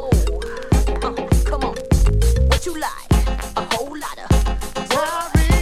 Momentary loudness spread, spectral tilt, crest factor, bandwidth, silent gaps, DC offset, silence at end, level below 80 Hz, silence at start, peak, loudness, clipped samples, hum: 8 LU; -5.5 dB/octave; 16 dB; 15 kHz; none; under 0.1%; 0 s; -20 dBFS; 0 s; -2 dBFS; -20 LUFS; under 0.1%; none